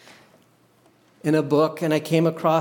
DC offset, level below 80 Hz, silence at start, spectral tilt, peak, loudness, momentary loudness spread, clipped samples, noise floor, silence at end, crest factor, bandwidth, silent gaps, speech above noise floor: under 0.1%; -74 dBFS; 1.25 s; -7 dB/octave; -6 dBFS; -22 LUFS; 4 LU; under 0.1%; -58 dBFS; 0 s; 18 dB; 18.5 kHz; none; 38 dB